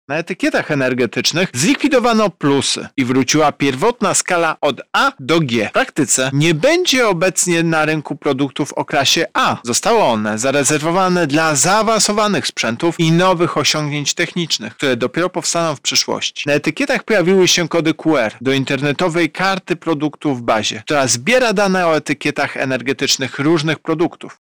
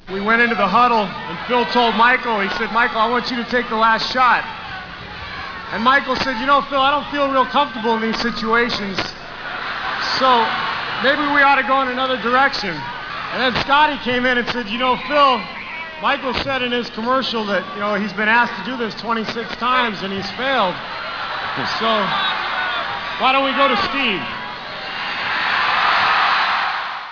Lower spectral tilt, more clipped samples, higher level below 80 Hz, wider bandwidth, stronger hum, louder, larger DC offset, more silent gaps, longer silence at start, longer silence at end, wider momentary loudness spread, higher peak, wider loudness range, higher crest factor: about the same, -3.5 dB/octave vs -4.5 dB/octave; neither; second, -52 dBFS vs -46 dBFS; first, over 20 kHz vs 5.4 kHz; neither; first, -15 LUFS vs -18 LUFS; about the same, 0.4% vs 0.2%; neither; about the same, 0.1 s vs 0.05 s; about the same, 0.1 s vs 0 s; second, 6 LU vs 11 LU; second, -6 dBFS vs -2 dBFS; about the same, 2 LU vs 3 LU; second, 10 dB vs 16 dB